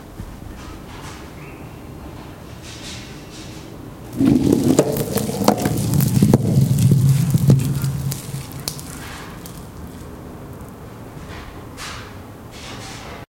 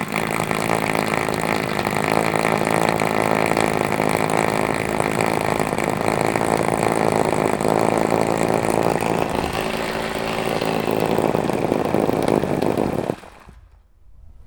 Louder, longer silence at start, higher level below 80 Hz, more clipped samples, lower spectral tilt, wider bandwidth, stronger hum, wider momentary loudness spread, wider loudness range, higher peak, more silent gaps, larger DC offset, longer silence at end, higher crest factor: about the same, -18 LUFS vs -20 LUFS; about the same, 0 s vs 0 s; about the same, -42 dBFS vs -44 dBFS; neither; first, -6.5 dB/octave vs -5 dB/octave; second, 17 kHz vs over 20 kHz; neither; first, 21 LU vs 4 LU; first, 18 LU vs 2 LU; about the same, 0 dBFS vs 0 dBFS; neither; neither; about the same, 0.1 s vs 0.05 s; about the same, 20 dB vs 20 dB